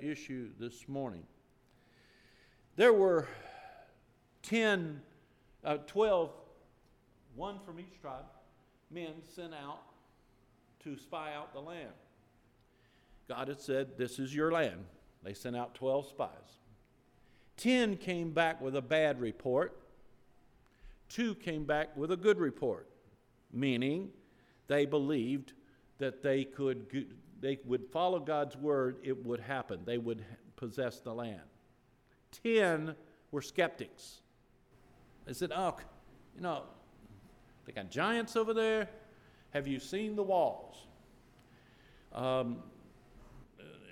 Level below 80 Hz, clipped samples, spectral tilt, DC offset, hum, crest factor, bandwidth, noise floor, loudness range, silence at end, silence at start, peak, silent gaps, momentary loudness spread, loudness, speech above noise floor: -66 dBFS; under 0.1%; -5.5 dB/octave; under 0.1%; none; 22 dB; 15.5 kHz; -68 dBFS; 13 LU; 0 s; 0 s; -14 dBFS; none; 20 LU; -35 LUFS; 34 dB